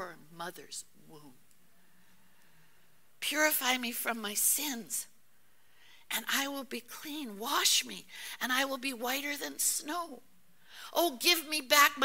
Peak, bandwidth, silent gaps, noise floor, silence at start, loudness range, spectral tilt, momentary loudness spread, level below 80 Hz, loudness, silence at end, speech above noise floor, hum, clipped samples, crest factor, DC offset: -8 dBFS; 16.5 kHz; none; -69 dBFS; 0 s; 4 LU; 0 dB/octave; 17 LU; -78 dBFS; -31 LUFS; 0 s; 37 dB; none; under 0.1%; 26 dB; 0.2%